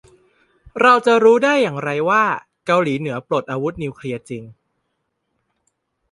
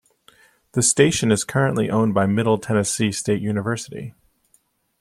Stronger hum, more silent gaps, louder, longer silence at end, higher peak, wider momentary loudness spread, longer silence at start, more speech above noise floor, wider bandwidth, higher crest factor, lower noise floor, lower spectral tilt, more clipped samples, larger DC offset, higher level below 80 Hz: neither; neither; first, -17 LUFS vs -20 LUFS; first, 1.6 s vs 0.9 s; about the same, -2 dBFS vs -2 dBFS; first, 16 LU vs 11 LU; about the same, 0.75 s vs 0.75 s; first, 56 dB vs 43 dB; second, 11 kHz vs 13.5 kHz; about the same, 18 dB vs 20 dB; first, -73 dBFS vs -63 dBFS; about the same, -5.5 dB/octave vs -4.5 dB/octave; neither; neither; about the same, -56 dBFS vs -56 dBFS